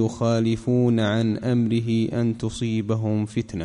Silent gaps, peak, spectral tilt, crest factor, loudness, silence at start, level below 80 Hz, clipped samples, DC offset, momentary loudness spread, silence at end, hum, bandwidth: none; -10 dBFS; -7.5 dB/octave; 12 dB; -23 LUFS; 0 s; -50 dBFS; under 0.1%; under 0.1%; 5 LU; 0 s; none; 10.5 kHz